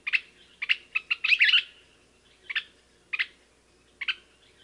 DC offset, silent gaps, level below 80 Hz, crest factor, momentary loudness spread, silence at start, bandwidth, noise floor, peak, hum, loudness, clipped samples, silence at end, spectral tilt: under 0.1%; none; -70 dBFS; 20 dB; 15 LU; 0.05 s; 11.5 kHz; -62 dBFS; -10 dBFS; none; -26 LUFS; under 0.1%; 0.5 s; 1.5 dB/octave